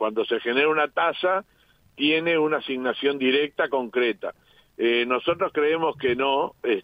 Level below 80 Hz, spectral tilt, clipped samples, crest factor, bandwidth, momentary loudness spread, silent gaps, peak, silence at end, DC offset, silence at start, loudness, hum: -64 dBFS; -6.5 dB/octave; under 0.1%; 16 dB; 5 kHz; 5 LU; none; -8 dBFS; 0 s; under 0.1%; 0 s; -23 LUFS; none